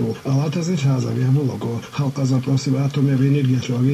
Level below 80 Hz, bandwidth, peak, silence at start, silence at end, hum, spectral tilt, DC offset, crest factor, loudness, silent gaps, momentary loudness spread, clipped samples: -56 dBFS; 11.5 kHz; -6 dBFS; 0 s; 0 s; none; -7.5 dB/octave; under 0.1%; 12 dB; -20 LUFS; none; 6 LU; under 0.1%